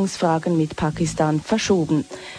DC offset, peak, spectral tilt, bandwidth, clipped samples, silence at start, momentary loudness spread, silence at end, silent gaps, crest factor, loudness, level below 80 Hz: under 0.1%; -6 dBFS; -5.5 dB/octave; 11 kHz; under 0.1%; 0 s; 4 LU; 0 s; none; 16 dB; -21 LUFS; -46 dBFS